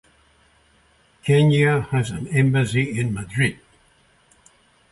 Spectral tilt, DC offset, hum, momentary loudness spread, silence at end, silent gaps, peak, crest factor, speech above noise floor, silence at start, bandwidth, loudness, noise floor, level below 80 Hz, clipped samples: -6.5 dB/octave; under 0.1%; none; 8 LU; 1.4 s; none; -6 dBFS; 16 dB; 39 dB; 1.25 s; 11.5 kHz; -20 LUFS; -58 dBFS; -50 dBFS; under 0.1%